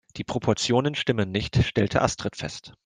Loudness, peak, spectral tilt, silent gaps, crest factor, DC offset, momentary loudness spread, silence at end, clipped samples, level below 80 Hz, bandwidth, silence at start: -25 LUFS; -4 dBFS; -5 dB/octave; none; 20 dB; under 0.1%; 9 LU; 0.15 s; under 0.1%; -46 dBFS; 9.8 kHz; 0.15 s